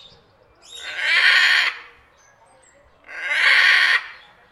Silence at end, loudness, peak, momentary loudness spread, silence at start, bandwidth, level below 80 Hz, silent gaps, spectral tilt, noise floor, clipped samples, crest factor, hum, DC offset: 0.4 s; -15 LUFS; -2 dBFS; 23 LU; 0.7 s; 14.5 kHz; -66 dBFS; none; 2.5 dB/octave; -54 dBFS; under 0.1%; 20 dB; none; under 0.1%